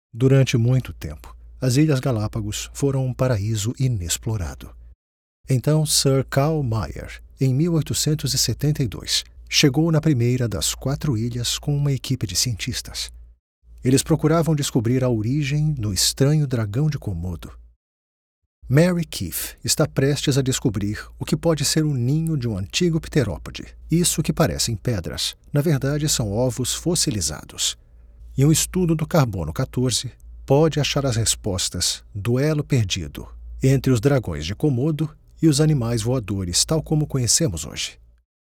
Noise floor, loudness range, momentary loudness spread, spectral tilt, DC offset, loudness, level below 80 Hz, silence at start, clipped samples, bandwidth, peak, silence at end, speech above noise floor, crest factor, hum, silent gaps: -44 dBFS; 3 LU; 10 LU; -5 dB/octave; under 0.1%; -21 LUFS; -40 dBFS; 0.15 s; under 0.1%; 18 kHz; -2 dBFS; 0.65 s; 23 dB; 18 dB; none; 4.95-5.44 s, 13.39-13.62 s, 17.76-18.62 s